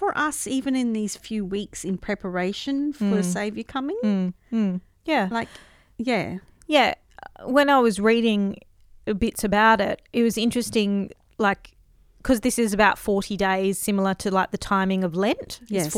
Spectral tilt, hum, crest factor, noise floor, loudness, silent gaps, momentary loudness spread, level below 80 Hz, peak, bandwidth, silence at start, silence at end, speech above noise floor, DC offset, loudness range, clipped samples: -4.5 dB/octave; none; 20 dB; -53 dBFS; -23 LUFS; none; 11 LU; -48 dBFS; -4 dBFS; 16 kHz; 0 s; 0 s; 31 dB; under 0.1%; 5 LU; under 0.1%